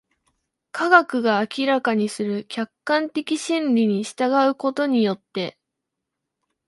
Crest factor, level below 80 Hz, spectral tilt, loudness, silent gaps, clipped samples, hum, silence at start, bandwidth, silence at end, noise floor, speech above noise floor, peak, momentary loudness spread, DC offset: 22 dB; -74 dBFS; -5 dB/octave; -21 LUFS; none; under 0.1%; none; 0.75 s; 11.5 kHz; 1.2 s; -82 dBFS; 61 dB; 0 dBFS; 13 LU; under 0.1%